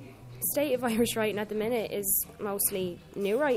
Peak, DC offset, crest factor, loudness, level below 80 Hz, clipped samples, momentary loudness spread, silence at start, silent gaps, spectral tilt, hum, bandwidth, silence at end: -14 dBFS; under 0.1%; 16 dB; -29 LUFS; -58 dBFS; under 0.1%; 7 LU; 0 s; none; -3.5 dB/octave; none; 16 kHz; 0 s